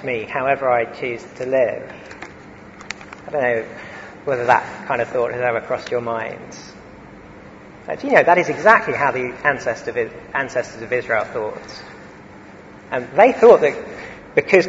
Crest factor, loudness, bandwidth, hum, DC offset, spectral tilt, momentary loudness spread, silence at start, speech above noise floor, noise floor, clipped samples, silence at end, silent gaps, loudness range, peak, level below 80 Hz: 20 dB; -18 LUFS; 8 kHz; none; under 0.1%; -5.5 dB/octave; 22 LU; 0 s; 22 dB; -40 dBFS; under 0.1%; 0 s; none; 7 LU; 0 dBFS; -54 dBFS